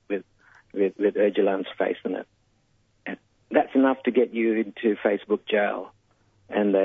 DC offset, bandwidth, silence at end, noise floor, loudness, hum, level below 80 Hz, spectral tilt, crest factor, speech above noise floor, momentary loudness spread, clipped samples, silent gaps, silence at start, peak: under 0.1%; 3.9 kHz; 0 s; -66 dBFS; -25 LUFS; none; -72 dBFS; -8.5 dB/octave; 18 dB; 43 dB; 16 LU; under 0.1%; none; 0.1 s; -6 dBFS